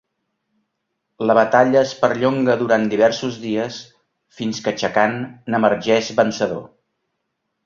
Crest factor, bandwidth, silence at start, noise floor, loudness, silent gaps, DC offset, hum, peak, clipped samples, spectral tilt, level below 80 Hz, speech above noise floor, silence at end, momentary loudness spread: 18 dB; 7.4 kHz; 1.2 s; -75 dBFS; -18 LUFS; none; under 0.1%; none; 0 dBFS; under 0.1%; -5 dB/octave; -60 dBFS; 57 dB; 1 s; 11 LU